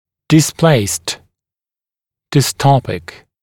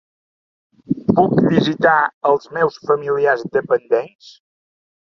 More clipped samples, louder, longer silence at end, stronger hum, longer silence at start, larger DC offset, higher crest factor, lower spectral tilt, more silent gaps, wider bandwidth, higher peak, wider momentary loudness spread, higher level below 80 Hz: neither; first, -14 LUFS vs -17 LUFS; second, 0.25 s vs 0.85 s; neither; second, 0.3 s vs 0.9 s; neither; about the same, 16 dB vs 16 dB; second, -5 dB/octave vs -7.5 dB/octave; second, none vs 2.14-2.21 s, 4.15-4.19 s; first, 17.5 kHz vs 7 kHz; about the same, 0 dBFS vs -2 dBFS; first, 13 LU vs 6 LU; first, -48 dBFS vs -56 dBFS